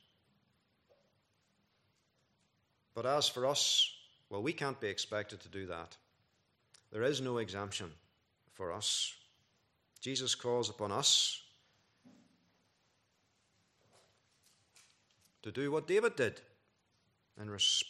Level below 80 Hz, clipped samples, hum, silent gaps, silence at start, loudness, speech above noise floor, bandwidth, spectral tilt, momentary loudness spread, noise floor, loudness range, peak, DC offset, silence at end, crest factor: -82 dBFS; under 0.1%; none; none; 2.95 s; -34 LUFS; 42 dB; 14 kHz; -2 dB/octave; 18 LU; -77 dBFS; 7 LU; -16 dBFS; under 0.1%; 0 s; 22 dB